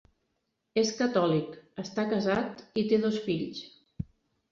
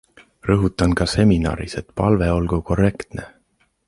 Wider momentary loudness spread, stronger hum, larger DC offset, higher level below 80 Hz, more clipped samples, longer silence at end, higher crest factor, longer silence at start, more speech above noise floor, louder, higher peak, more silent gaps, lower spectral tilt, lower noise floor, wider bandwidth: about the same, 16 LU vs 14 LU; neither; neither; second, -60 dBFS vs -32 dBFS; neither; second, 0.45 s vs 0.6 s; about the same, 18 dB vs 18 dB; first, 0.75 s vs 0.45 s; first, 51 dB vs 45 dB; second, -29 LUFS vs -19 LUFS; second, -14 dBFS vs -2 dBFS; neither; second, -5.5 dB/octave vs -7 dB/octave; first, -79 dBFS vs -64 dBFS; second, 7.6 kHz vs 11.5 kHz